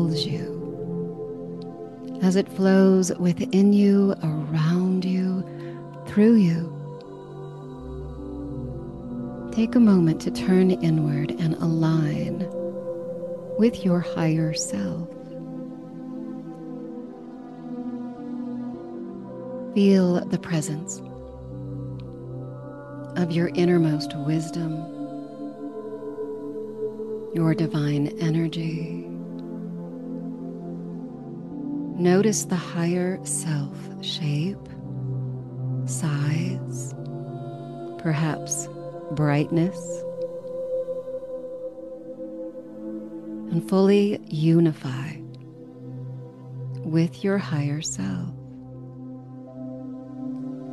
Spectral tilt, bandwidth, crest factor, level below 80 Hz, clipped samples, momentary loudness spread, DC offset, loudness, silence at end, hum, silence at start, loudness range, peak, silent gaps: -6.5 dB/octave; 12.5 kHz; 18 dB; -54 dBFS; under 0.1%; 18 LU; under 0.1%; -25 LUFS; 0 s; none; 0 s; 10 LU; -8 dBFS; none